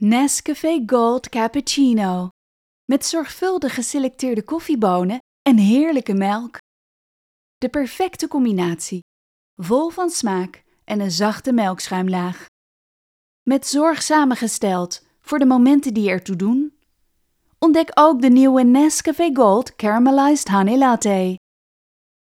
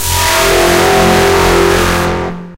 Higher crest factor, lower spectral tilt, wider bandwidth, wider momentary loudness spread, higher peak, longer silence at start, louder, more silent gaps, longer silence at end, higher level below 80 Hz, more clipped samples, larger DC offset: first, 18 dB vs 10 dB; first, -5 dB/octave vs -3.5 dB/octave; about the same, 16 kHz vs 17 kHz; first, 12 LU vs 5 LU; about the same, 0 dBFS vs 0 dBFS; about the same, 0 s vs 0 s; second, -18 LUFS vs -9 LUFS; first, 2.31-2.88 s, 5.20-5.45 s, 6.59-7.61 s, 9.02-9.57 s, 12.48-13.46 s vs none; first, 0.9 s vs 0 s; second, -58 dBFS vs -24 dBFS; neither; neither